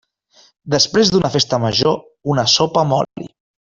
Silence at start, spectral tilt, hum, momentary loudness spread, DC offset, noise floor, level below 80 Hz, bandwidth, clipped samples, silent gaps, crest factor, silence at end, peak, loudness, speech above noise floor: 0.65 s; -4 dB/octave; none; 10 LU; under 0.1%; -53 dBFS; -50 dBFS; 7.6 kHz; under 0.1%; none; 16 dB; 0.35 s; 0 dBFS; -16 LUFS; 37 dB